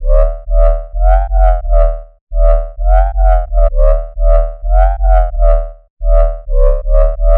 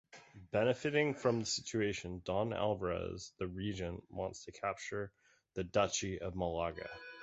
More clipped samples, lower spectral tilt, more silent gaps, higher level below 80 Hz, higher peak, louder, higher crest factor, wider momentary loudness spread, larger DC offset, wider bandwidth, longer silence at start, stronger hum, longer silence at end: neither; first, -9.5 dB/octave vs -4.5 dB/octave; first, 2.21-2.27 s, 5.90-5.97 s vs none; first, -10 dBFS vs -58 dBFS; first, -2 dBFS vs -18 dBFS; first, -14 LUFS vs -38 LUFS; second, 8 dB vs 20 dB; second, 4 LU vs 11 LU; neither; second, 2.3 kHz vs 8 kHz; second, 0 s vs 0.15 s; neither; about the same, 0 s vs 0 s